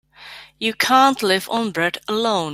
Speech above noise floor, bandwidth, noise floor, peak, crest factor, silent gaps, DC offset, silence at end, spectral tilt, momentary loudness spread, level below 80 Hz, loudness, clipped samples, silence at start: 23 dB; 16 kHz; -41 dBFS; -2 dBFS; 18 dB; none; under 0.1%; 0 s; -3 dB/octave; 22 LU; -62 dBFS; -18 LUFS; under 0.1%; 0.2 s